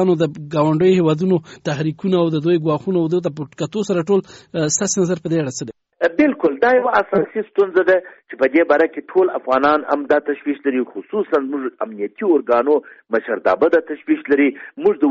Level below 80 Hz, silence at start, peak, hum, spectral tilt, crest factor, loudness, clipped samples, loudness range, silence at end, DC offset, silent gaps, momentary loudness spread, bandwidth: -60 dBFS; 0 s; -4 dBFS; none; -5.5 dB/octave; 14 dB; -18 LUFS; under 0.1%; 3 LU; 0 s; under 0.1%; none; 9 LU; 8 kHz